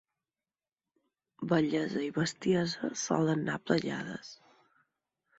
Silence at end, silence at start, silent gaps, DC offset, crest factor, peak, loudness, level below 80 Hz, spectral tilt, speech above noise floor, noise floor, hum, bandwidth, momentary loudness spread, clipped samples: 1.05 s; 1.4 s; none; under 0.1%; 22 dB; -12 dBFS; -32 LUFS; -70 dBFS; -5 dB/octave; over 59 dB; under -90 dBFS; none; 8.2 kHz; 12 LU; under 0.1%